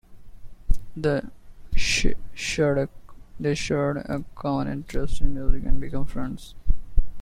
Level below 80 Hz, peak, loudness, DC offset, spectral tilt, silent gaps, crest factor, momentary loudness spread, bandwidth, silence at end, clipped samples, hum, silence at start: -28 dBFS; -4 dBFS; -28 LUFS; under 0.1%; -5 dB/octave; none; 16 dB; 10 LU; 10 kHz; 0 s; under 0.1%; none; 0.1 s